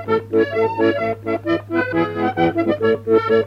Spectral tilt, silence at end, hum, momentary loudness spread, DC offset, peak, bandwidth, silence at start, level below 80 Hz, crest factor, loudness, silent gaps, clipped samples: -8 dB/octave; 0 s; none; 5 LU; under 0.1%; -4 dBFS; 6.2 kHz; 0 s; -52 dBFS; 14 dB; -19 LUFS; none; under 0.1%